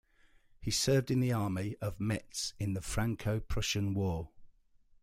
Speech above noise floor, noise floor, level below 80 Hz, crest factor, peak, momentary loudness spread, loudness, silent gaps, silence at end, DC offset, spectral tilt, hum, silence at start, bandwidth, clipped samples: 32 dB; -64 dBFS; -48 dBFS; 16 dB; -18 dBFS; 9 LU; -34 LUFS; none; 0.55 s; under 0.1%; -5 dB/octave; none; 0.6 s; 15.5 kHz; under 0.1%